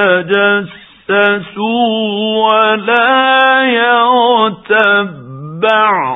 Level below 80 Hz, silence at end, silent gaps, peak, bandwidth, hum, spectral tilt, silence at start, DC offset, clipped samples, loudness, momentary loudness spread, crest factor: -60 dBFS; 0 s; none; 0 dBFS; 4 kHz; none; -7 dB/octave; 0 s; under 0.1%; under 0.1%; -11 LUFS; 8 LU; 12 dB